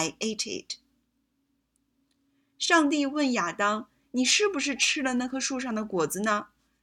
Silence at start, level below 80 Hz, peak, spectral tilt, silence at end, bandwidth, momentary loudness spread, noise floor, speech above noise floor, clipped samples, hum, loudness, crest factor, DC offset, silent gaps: 0 s; -68 dBFS; -8 dBFS; -2 dB/octave; 0.4 s; 17 kHz; 11 LU; -75 dBFS; 48 dB; under 0.1%; none; -26 LUFS; 22 dB; under 0.1%; none